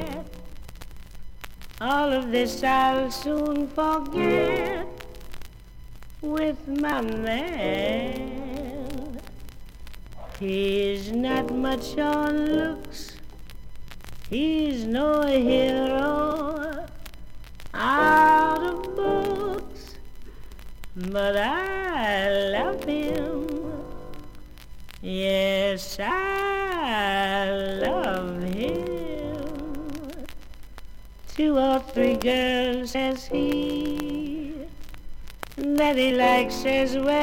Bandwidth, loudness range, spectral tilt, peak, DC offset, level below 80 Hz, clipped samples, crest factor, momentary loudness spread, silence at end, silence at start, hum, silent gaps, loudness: 17 kHz; 6 LU; -5 dB/octave; -8 dBFS; under 0.1%; -42 dBFS; under 0.1%; 18 dB; 22 LU; 0 s; 0 s; none; none; -25 LUFS